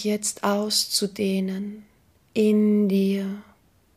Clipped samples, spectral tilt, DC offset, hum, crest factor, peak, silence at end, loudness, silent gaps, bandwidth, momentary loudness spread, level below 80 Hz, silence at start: under 0.1%; -4.5 dB/octave; under 0.1%; none; 16 dB; -8 dBFS; 0.55 s; -23 LUFS; none; 15.5 kHz; 13 LU; -68 dBFS; 0 s